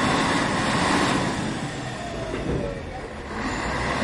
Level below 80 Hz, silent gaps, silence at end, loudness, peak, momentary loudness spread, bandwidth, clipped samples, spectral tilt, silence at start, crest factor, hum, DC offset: -40 dBFS; none; 0 s; -25 LUFS; -8 dBFS; 11 LU; 11.5 kHz; under 0.1%; -4.5 dB/octave; 0 s; 18 dB; none; under 0.1%